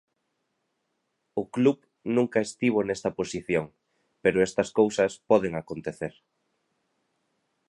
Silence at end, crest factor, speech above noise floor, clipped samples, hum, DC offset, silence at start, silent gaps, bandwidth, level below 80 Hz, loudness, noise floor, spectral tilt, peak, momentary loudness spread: 1.6 s; 20 dB; 52 dB; under 0.1%; none; under 0.1%; 1.35 s; none; 11.5 kHz; -62 dBFS; -26 LUFS; -78 dBFS; -5.5 dB/octave; -8 dBFS; 12 LU